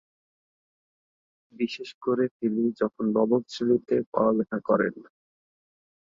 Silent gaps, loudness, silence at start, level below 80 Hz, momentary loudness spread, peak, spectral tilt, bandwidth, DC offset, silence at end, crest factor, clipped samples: 1.94-2.01 s, 2.31-2.40 s, 4.06-4.12 s; -26 LUFS; 1.6 s; -70 dBFS; 7 LU; -10 dBFS; -7 dB/octave; 7.6 kHz; under 0.1%; 1 s; 18 dB; under 0.1%